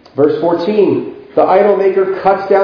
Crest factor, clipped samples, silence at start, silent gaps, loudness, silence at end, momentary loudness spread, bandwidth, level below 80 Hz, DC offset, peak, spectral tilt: 12 dB; 0.1%; 0.15 s; none; -12 LUFS; 0 s; 5 LU; 5.4 kHz; -54 dBFS; under 0.1%; 0 dBFS; -8.5 dB/octave